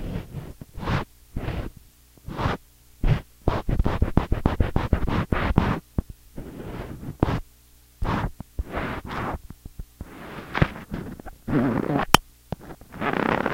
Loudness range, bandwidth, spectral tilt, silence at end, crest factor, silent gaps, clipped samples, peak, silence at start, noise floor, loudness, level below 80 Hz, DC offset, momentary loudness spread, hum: 6 LU; 16 kHz; -6 dB/octave; 0 s; 26 dB; none; under 0.1%; 0 dBFS; 0 s; -54 dBFS; -27 LUFS; -32 dBFS; under 0.1%; 16 LU; none